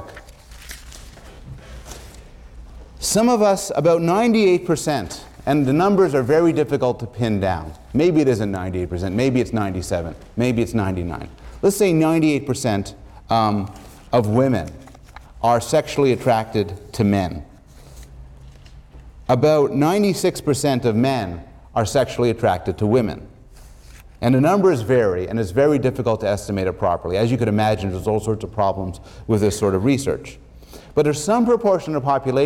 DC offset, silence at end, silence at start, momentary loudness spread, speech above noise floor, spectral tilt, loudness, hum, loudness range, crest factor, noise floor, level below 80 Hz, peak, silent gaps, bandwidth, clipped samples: under 0.1%; 0 s; 0 s; 14 LU; 24 dB; -6 dB/octave; -19 LUFS; none; 4 LU; 14 dB; -43 dBFS; -42 dBFS; -6 dBFS; none; 17 kHz; under 0.1%